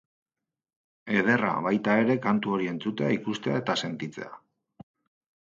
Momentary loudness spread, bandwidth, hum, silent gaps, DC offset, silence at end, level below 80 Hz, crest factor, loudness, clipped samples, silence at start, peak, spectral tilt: 12 LU; 7.6 kHz; none; none; under 0.1%; 1.1 s; -72 dBFS; 20 dB; -27 LUFS; under 0.1%; 1.05 s; -8 dBFS; -6 dB/octave